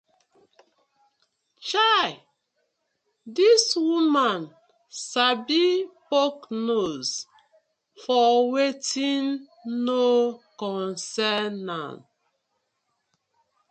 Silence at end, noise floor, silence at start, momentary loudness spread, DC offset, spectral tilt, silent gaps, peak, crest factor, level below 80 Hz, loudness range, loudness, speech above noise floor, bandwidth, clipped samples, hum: 1.75 s; -76 dBFS; 1.6 s; 14 LU; under 0.1%; -3 dB/octave; none; -6 dBFS; 20 dB; -78 dBFS; 5 LU; -23 LUFS; 53 dB; 9.2 kHz; under 0.1%; none